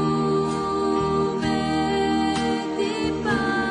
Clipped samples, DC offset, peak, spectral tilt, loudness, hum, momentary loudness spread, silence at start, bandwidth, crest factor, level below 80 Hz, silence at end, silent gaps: under 0.1%; under 0.1%; -10 dBFS; -5.5 dB/octave; -23 LUFS; none; 3 LU; 0 s; 10.5 kHz; 12 dB; -44 dBFS; 0 s; none